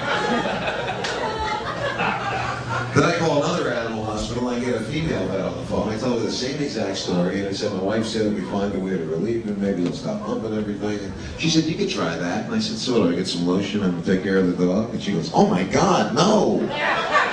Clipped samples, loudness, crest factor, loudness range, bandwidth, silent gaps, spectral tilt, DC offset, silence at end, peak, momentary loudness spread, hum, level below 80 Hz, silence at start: under 0.1%; -22 LUFS; 20 dB; 4 LU; 10 kHz; none; -5 dB/octave; under 0.1%; 0 s; -2 dBFS; 7 LU; none; -46 dBFS; 0 s